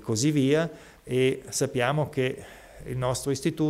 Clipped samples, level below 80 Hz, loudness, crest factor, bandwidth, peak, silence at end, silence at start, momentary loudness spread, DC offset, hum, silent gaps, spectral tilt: under 0.1%; -54 dBFS; -27 LUFS; 18 dB; 16 kHz; -10 dBFS; 0 s; 0 s; 16 LU; under 0.1%; none; none; -5 dB/octave